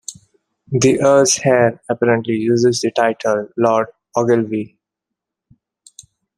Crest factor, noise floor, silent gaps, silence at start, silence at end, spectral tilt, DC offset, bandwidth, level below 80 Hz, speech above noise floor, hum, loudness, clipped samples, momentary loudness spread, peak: 16 dB; -82 dBFS; none; 0.1 s; 1.7 s; -4.5 dB/octave; under 0.1%; 13 kHz; -58 dBFS; 67 dB; none; -16 LUFS; under 0.1%; 11 LU; 0 dBFS